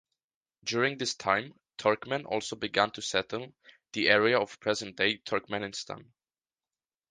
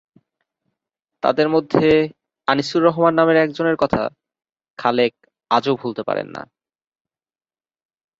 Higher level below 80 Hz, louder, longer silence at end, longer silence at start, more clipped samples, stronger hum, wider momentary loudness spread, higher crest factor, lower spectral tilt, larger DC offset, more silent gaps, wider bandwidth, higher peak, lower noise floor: second, -68 dBFS vs -54 dBFS; second, -29 LUFS vs -19 LUFS; second, 1.1 s vs 1.8 s; second, 0.65 s vs 1.25 s; neither; neither; first, 15 LU vs 10 LU; first, 24 dB vs 18 dB; second, -3 dB/octave vs -6.5 dB/octave; neither; second, none vs 4.70-4.74 s; first, 9.8 kHz vs 7.8 kHz; second, -6 dBFS vs -2 dBFS; about the same, under -90 dBFS vs under -90 dBFS